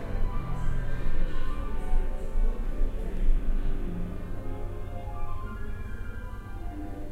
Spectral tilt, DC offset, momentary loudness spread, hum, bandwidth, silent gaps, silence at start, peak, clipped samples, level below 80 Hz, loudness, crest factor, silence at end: -7.5 dB/octave; under 0.1%; 7 LU; none; 3.8 kHz; none; 0 s; -10 dBFS; under 0.1%; -28 dBFS; -36 LUFS; 14 dB; 0 s